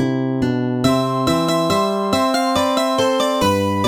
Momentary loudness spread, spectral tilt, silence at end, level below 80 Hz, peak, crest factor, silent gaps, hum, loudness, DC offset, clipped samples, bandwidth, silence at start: 3 LU; -5 dB/octave; 0 s; -46 dBFS; -2 dBFS; 14 dB; none; none; -17 LUFS; under 0.1%; under 0.1%; over 20 kHz; 0 s